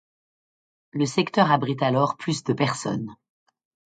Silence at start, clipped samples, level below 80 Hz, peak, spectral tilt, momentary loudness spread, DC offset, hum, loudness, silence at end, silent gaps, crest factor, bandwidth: 0.95 s; under 0.1%; -66 dBFS; -4 dBFS; -5.5 dB/octave; 11 LU; under 0.1%; none; -23 LUFS; 0.8 s; none; 22 dB; 9.4 kHz